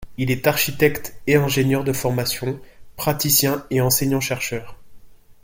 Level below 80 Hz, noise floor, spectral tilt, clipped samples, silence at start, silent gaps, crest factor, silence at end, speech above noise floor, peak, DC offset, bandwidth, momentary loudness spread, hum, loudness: -46 dBFS; -42 dBFS; -4 dB/octave; under 0.1%; 0 s; none; 18 dB; 0.1 s; 21 dB; -2 dBFS; under 0.1%; 17 kHz; 10 LU; none; -20 LUFS